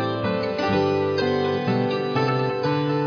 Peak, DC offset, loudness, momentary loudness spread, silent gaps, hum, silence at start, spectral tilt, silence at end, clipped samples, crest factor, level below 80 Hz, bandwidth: -10 dBFS; under 0.1%; -23 LUFS; 3 LU; none; none; 0 s; -7.5 dB/octave; 0 s; under 0.1%; 12 dB; -56 dBFS; 5.4 kHz